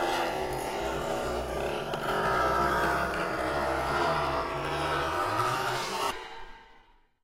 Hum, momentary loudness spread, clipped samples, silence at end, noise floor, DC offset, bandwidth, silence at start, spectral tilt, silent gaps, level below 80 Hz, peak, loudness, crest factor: none; 6 LU; under 0.1%; 0.5 s; -60 dBFS; under 0.1%; 16 kHz; 0 s; -4 dB/octave; none; -46 dBFS; -16 dBFS; -29 LUFS; 14 dB